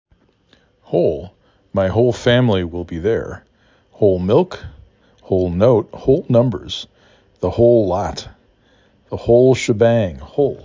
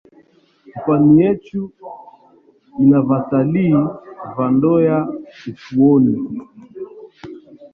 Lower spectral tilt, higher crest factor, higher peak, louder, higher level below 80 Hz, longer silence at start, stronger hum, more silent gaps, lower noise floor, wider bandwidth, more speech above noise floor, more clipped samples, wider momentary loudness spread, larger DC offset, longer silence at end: second, -7 dB/octave vs -11 dB/octave; about the same, 16 dB vs 16 dB; about the same, -2 dBFS vs -2 dBFS; about the same, -17 LUFS vs -15 LUFS; first, -38 dBFS vs -54 dBFS; first, 0.9 s vs 0.75 s; neither; neither; first, -56 dBFS vs -52 dBFS; first, 7.6 kHz vs 5.2 kHz; about the same, 40 dB vs 37 dB; neither; second, 14 LU vs 23 LU; neither; about the same, 0.05 s vs 0.05 s